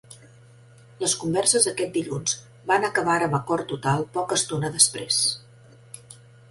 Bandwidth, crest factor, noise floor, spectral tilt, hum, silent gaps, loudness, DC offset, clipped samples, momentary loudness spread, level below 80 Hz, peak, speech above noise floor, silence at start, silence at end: 12 kHz; 24 dB; -51 dBFS; -2.5 dB/octave; none; none; -23 LUFS; under 0.1%; under 0.1%; 12 LU; -60 dBFS; -2 dBFS; 27 dB; 0.1 s; 0.35 s